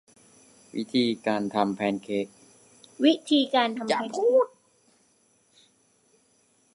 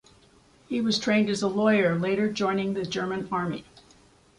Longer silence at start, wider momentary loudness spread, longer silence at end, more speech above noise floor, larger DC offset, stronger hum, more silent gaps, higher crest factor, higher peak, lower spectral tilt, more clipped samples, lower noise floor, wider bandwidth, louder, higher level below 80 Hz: about the same, 0.75 s vs 0.7 s; about the same, 9 LU vs 8 LU; first, 2.3 s vs 0.75 s; first, 41 dB vs 33 dB; neither; neither; neither; about the same, 20 dB vs 16 dB; first, -6 dBFS vs -10 dBFS; about the same, -5 dB/octave vs -5.5 dB/octave; neither; first, -65 dBFS vs -58 dBFS; about the same, 11.5 kHz vs 11 kHz; about the same, -25 LUFS vs -26 LUFS; second, -74 dBFS vs -62 dBFS